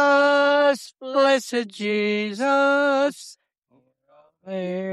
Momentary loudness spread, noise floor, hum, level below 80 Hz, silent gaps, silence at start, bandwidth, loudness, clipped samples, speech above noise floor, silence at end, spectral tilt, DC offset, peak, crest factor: 12 LU; -64 dBFS; none; -80 dBFS; 3.58-3.62 s; 0 s; 13 kHz; -21 LUFS; under 0.1%; 41 dB; 0 s; -4 dB/octave; under 0.1%; -8 dBFS; 14 dB